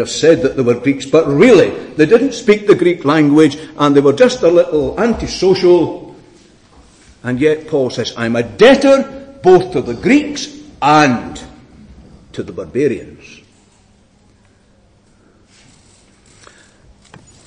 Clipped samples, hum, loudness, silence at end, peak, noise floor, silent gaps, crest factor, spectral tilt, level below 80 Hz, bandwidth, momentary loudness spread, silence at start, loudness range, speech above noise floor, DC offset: under 0.1%; none; -12 LUFS; 4.3 s; 0 dBFS; -50 dBFS; none; 14 dB; -5.5 dB/octave; -44 dBFS; 10 kHz; 15 LU; 0 s; 14 LU; 39 dB; under 0.1%